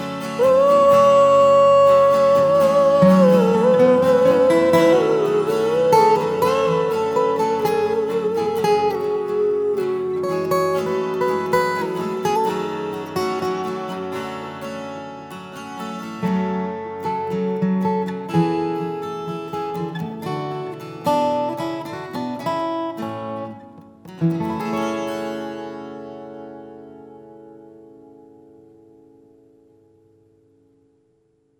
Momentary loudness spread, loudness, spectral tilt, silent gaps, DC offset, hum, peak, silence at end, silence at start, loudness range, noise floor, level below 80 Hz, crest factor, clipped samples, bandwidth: 17 LU; -19 LUFS; -6.5 dB/octave; none; under 0.1%; none; -2 dBFS; 3.9 s; 0 s; 13 LU; -63 dBFS; -66 dBFS; 16 dB; under 0.1%; 20 kHz